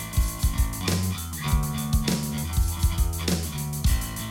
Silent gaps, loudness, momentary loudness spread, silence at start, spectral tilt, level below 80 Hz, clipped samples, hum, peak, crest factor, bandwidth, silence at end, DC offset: none; -27 LUFS; 3 LU; 0 s; -4.5 dB/octave; -28 dBFS; under 0.1%; none; -10 dBFS; 14 dB; 17.5 kHz; 0 s; under 0.1%